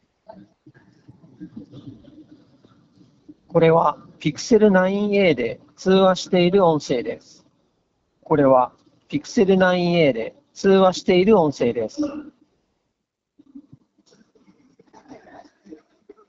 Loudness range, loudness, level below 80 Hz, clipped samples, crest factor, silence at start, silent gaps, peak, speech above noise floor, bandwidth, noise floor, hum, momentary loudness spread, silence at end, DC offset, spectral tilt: 6 LU; -19 LUFS; -56 dBFS; under 0.1%; 18 dB; 1.4 s; none; -2 dBFS; 60 dB; 7.8 kHz; -79 dBFS; none; 14 LU; 0.55 s; under 0.1%; -5 dB/octave